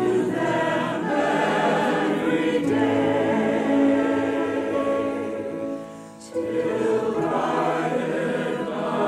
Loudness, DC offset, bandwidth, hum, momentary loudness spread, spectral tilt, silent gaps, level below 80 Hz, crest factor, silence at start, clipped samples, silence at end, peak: -23 LUFS; under 0.1%; 12.5 kHz; none; 8 LU; -6 dB/octave; none; -60 dBFS; 14 dB; 0 s; under 0.1%; 0 s; -10 dBFS